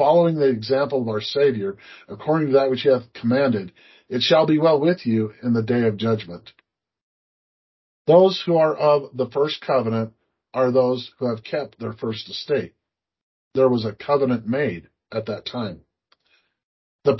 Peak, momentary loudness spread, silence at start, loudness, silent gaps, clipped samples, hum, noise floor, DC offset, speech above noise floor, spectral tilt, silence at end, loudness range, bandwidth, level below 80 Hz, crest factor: -2 dBFS; 13 LU; 0 s; -21 LUFS; 7.03-8.05 s, 13.23-13.51 s, 16.64-16.99 s; under 0.1%; none; -65 dBFS; under 0.1%; 45 dB; -7.5 dB/octave; 0 s; 5 LU; 6 kHz; -62 dBFS; 18 dB